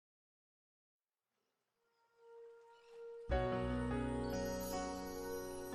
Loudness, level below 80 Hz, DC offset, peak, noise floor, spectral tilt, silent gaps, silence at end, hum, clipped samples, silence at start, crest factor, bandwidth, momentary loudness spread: -41 LUFS; -52 dBFS; under 0.1%; -24 dBFS; under -90 dBFS; -5.5 dB/octave; none; 0 s; none; under 0.1%; 2.2 s; 20 dB; 13 kHz; 21 LU